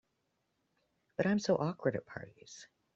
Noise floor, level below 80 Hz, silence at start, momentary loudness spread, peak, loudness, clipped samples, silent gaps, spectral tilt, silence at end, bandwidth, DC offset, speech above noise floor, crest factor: -81 dBFS; -74 dBFS; 1.2 s; 21 LU; -18 dBFS; -34 LUFS; under 0.1%; none; -6 dB/octave; 0.3 s; 7.8 kHz; under 0.1%; 47 dB; 20 dB